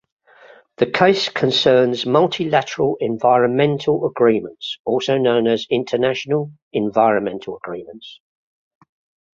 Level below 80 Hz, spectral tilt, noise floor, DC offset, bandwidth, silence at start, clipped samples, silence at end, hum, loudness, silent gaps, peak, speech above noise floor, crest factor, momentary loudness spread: -60 dBFS; -5.5 dB/octave; -47 dBFS; under 0.1%; 7.6 kHz; 0.8 s; under 0.1%; 1.2 s; none; -18 LUFS; 4.80-4.85 s, 6.62-6.71 s; 0 dBFS; 30 dB; 18 dB; 13 LU